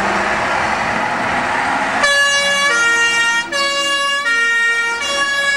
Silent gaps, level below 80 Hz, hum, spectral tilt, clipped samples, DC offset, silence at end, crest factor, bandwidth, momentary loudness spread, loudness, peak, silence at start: none; -48 dBFS; none; -1 dB/octave; under 0.1%; 0.2%; 0 s; 12 dB; 13.5 kHz; 5 LU; -14 LUFS; -4 dBFS; 0 s